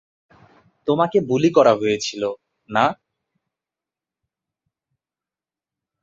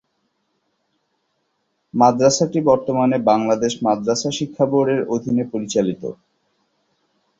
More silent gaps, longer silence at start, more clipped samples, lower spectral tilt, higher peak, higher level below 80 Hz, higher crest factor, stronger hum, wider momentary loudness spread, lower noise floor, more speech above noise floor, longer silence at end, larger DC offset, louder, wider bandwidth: neither; second, 0.85 s vs 1.95 s; neither; about the same, -5.5 dB/octave vs -5 dB/octave; about the same, -2 dBFS vs -2 dBFS; second, -64 dBFS vs -58 dBFS; about the same, 22 dB vs 18 dB; neither; first, 14 LU vs 7 LU; first, under -90 dBFS vs -70 dBFS; first, over 72 dB vs 53 dB; first, 3.1 s vs 1.25 s; neither; about the same, -19 LUFS vs -18 LUFS; about the same, 7.8 kHz vs 8 kHz